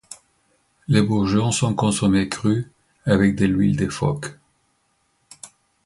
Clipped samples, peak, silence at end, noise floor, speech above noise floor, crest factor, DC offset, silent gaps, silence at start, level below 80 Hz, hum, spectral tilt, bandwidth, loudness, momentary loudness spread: under 0.1%; -4 dBFS; 0.4 s; -67 dBFS; 48 dB; 18 dB; under 0.1%; none; 0.1 s; -46 dBFS; none; -6 dB/octave; 11.5 kHz; -20 LUFS; 23 LU